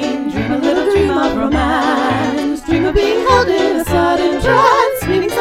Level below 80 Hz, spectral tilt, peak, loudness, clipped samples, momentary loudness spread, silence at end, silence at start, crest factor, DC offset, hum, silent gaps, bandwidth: -30 dBFS; -5.5 dB/octave; 0 dBFS; -14 LUFS; under 0.1%; 5 LU; 0 s; 0 s; 14 dB; under 0.1%; none; none; 16.5 kHz